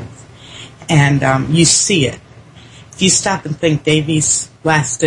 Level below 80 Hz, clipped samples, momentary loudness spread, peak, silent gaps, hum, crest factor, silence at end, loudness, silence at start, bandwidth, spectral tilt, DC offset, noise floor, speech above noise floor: -46 dBFS; under 0.1%; 21 LU; 0 dBFS; none; none; 16 dB; 0 s; -13 LUFS; 0 s; 11.5 kHz; -3.5 dB/octave; under 0.1%; -39 dBFS; 26 dB